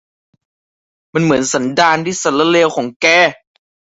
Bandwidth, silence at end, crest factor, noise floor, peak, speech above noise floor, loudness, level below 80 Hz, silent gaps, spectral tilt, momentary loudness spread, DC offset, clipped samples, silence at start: 8 kHz; 0.65 s; 14 dB; under -90 dBFS; 0 dBFS; over 77 dB; -13 LUFS; -54 dBFS; 2.96-3.00 s; -3.5 dB/octave; 6 LU; under 0.1%; under 0.1%; 1.15 s